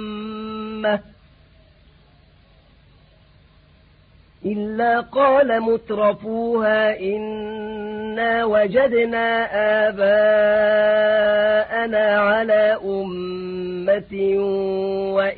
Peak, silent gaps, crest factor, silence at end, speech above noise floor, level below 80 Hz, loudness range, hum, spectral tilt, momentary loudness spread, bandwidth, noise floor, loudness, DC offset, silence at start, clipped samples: -6 dBFS; none; 14 dB; 0 s; 34 dB; -54 dBFS; 13 LU; none; -10 dB/octave; 12 LU; 4.7 kHz; -52 dBFS; -19 LUFS; under 0.1%; 0 s; under 0.1%